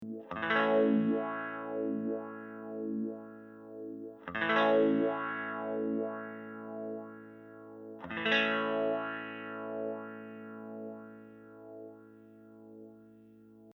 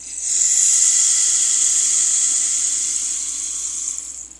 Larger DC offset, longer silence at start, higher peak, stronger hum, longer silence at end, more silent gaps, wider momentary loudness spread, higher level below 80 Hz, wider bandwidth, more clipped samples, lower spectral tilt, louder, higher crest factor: neither; about the same, 0 s vs 0 s; second, -14 dBFS vs 0 dBFS; first, 60 Hz at -85 dBFS vs none; about the same, 0.05 s vs 0.1 s; neither; first, 23 LU vs 10 LU; second, -78 dBFS vs -56 dBFS; second, 6.4 kHz vs 11.5 kHz; neither; first, -6.5 dB/octave vs 3.5 dB/octave; second, -33 LUFS vs -15 LUFS; about the same, 20 dB vs 18 dB